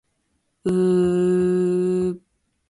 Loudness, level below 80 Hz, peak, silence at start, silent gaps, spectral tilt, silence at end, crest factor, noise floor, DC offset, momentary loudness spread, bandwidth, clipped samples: -21 LUFS; -54 dBFS; -10 dBFS; 0.65 s; none; -8.5 dB/octave; 0.5 s; 10 dB; -71 dBFS; under 0.1%; 9 LU; 11.5 kHz; under 0.1%